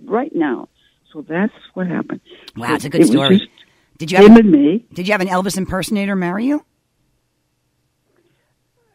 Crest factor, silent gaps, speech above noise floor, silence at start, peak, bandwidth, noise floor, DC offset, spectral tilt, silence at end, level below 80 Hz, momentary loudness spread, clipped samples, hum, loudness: 16 dB; none; 53 dB; 0.05 s; 0 dBFS; 15 kHz; -67 dBFS; under 0.1%; -6 dB/octave; 2.35 s; -46 dBFS; 20 LU; 0.2%; none; -14 LUFS